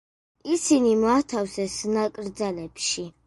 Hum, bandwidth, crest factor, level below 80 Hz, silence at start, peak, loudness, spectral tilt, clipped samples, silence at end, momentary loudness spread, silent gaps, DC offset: none; 11.5 kHz; 16 dB; -58 dBFS; 0.45 s; -8 dBFS; -24 LUFS; -3.5 dB/octave; under 0.1%; 0.15 s; 10 LU; none; under 0.1%